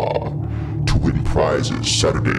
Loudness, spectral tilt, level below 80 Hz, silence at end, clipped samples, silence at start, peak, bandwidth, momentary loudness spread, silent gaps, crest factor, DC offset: -19 LUFS; -5 dB/octave; -28 dBFS; 0 s; under 0.1%; 0 s; -6 dBFS; 12 kHz; 8 LU; none; 12 dB; under 0.1%